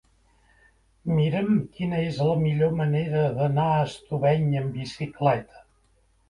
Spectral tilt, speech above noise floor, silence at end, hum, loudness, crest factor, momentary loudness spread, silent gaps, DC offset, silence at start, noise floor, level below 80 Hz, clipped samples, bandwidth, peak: -8.5 dB/octave; 40 dB; 0.7 s; none; -25 LUFS; 18 dB; 7 LU; none; under 0.1%; 1.05 s; -64 dBFS; -54 dBFS; under 0.1%; 10.5 kHz; -8 dBFS